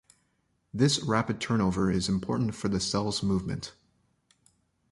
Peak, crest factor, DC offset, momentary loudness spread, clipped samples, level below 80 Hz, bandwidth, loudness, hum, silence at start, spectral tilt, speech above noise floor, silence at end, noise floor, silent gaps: -10 dBFS; 20 dB; under 0.1%; 9 LU; under 0.1%; -52 dBFS; 11.5 kHz; -28 LUFS; none; 0.75 s; -5 dB/octave; 46 dB; 1.2 s; -73 dBFS; none